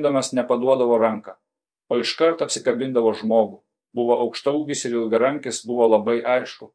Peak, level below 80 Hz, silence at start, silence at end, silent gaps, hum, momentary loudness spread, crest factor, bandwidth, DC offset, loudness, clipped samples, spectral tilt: -4 dBFS; -80 dBFS; 0 s; 0.1 s; none; none; 8 LU; 16 dB; 10.5 kHz; under 0.1%; -21 LUFS; under 0.1%; -4 dB/octave